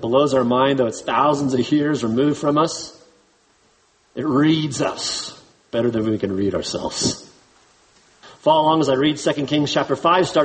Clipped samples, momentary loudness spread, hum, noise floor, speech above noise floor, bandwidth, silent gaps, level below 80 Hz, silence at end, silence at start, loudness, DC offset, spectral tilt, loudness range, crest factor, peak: under 0.1%; 8 LU; none; -59 dBFS; 40 dB; 8.8 kHz; none; -54 dBFS; 0 s; 0 s; -19 LUFS; under 0.1%; -5 dB/octave; 4 LU; 18 dB; -2 dBFS